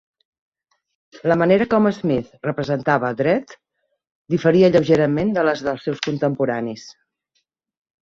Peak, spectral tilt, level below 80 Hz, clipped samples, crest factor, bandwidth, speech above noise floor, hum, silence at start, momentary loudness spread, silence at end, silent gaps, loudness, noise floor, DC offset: -2 dBFS; -7 dB/octave; -56 dBFS; under 0.1%; 18 dB; 7.6 kHz; 53 dB; none; 1.15 s; 11 LU; 1.1 s; 4.11-4.25 s; -19 LUFS; -72 dBFS; under 0.1%